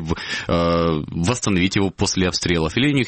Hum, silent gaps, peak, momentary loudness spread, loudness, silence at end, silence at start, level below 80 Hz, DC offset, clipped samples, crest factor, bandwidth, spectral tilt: none; none; -6 dBFS; 4 LU; -20 LUFS; 0 s; 0 s; -38 dBFS; under 0.1%; under 0.1%; 14 dB; 8.8 kHz; -4.5 dB/octave